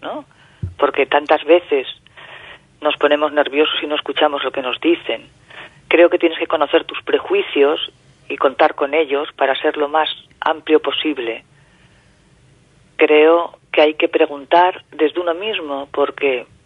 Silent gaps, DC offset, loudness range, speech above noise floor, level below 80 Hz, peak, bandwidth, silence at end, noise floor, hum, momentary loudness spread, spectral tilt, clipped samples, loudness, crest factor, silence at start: none; under 0.1%; 3 LU; 35 dB; -56 dBFS; 0 dBFS; 5.4 kHz; 0.2 s; -51 dBFS; none; 16 LU; -6 dB/octave; under 0.1%; -17 LUFS; 18 dB; 0 s